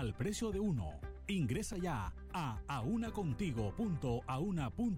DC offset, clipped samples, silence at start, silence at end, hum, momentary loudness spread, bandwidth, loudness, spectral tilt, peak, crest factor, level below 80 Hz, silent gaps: under 0.1%; under 0.1%; 0 s; 0 s; none; 5 LU; 16 kHz; -39 LUFS; -6.5 dB/octave; -26 dBFS; 12 dB; -50 dBFS; none